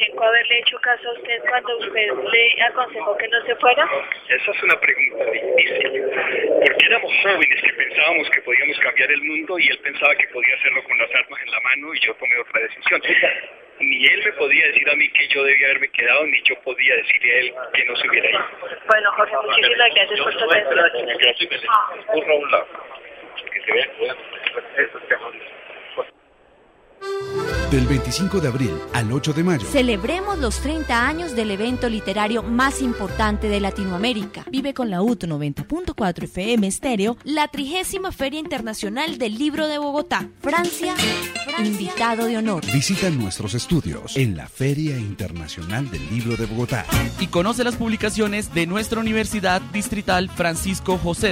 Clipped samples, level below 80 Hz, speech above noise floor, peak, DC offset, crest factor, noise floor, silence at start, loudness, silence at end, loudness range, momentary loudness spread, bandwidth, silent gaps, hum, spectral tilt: under 0.1%; -40 dBFS; 34 dB; 0 dBFS; under 0.1%; 20 dB; -54 dBFS; 0 s; -18 LUFS; 0 s; 8 LU; 11 LU; 16 kHz; none; none; -4 dB/octave